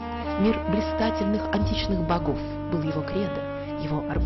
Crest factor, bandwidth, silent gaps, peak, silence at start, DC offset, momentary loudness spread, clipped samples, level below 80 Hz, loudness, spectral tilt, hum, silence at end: 12 dB; 6.2 kHz; none; -14 dBFS; 0 s; under 0.1%; 6 LU; under 0.1%; -38 dBFS; -26 LUFS; -8 dB/octave; none; 0 s